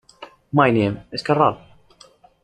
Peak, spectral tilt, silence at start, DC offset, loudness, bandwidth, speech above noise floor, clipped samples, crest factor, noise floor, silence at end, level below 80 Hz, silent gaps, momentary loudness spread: -2 dBFS; -7.5 dB/octave; 0.2 s; under 0.1%; -19 LUFS; 9.8 kHz; 33 dB; under 0.1%; 20 dB; -51 dBFS; 0.85 s; -54 dBFS; none; 10 LU